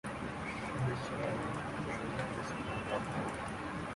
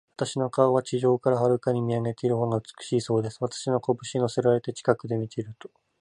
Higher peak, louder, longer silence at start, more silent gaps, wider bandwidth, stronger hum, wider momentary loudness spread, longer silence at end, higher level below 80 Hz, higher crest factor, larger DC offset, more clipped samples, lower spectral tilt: second, -22 dBFS vs -6 dBFS; second, -39 LUFS vs -26 LUFS; second, 0.05 s vs 0.2 s; neither; about the same, 11.5 kHz vs 11 kHz; neither; second, 4 LU vs 8 LU; second, 0 s vs 0.35 s; first, -56 dBFS vs -64 dBFS; about the same, 16 dB vs 20 dB; neither; neither; about the same, -6 dB/octave vs -6.5 dB/octave